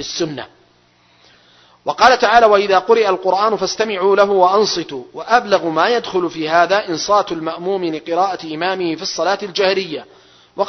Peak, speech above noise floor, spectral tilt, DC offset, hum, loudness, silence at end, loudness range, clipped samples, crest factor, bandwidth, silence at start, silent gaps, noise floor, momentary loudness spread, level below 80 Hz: 0 dBFS; 38 dB; -3.5 dB/octave; under 0.1%; none; -15 LUFS; 0 s; 5 LU; under 0.1%; 16 dB; 6.4 kHz; 0 s; none; -54 dBFS; 11 LU; -54 dBFS